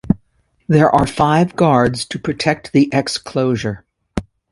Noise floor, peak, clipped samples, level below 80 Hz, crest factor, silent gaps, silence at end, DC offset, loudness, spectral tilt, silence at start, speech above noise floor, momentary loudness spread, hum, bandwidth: -60 dBFS; 0 dBFS; under 0.1%; -40 dBFS; 16 dB; none; 0.3 s; under 0.1%; -16 LUFS; -6 dB/octave; 0.05 s; 45 dB; 15 LU; none; 11.5 kHz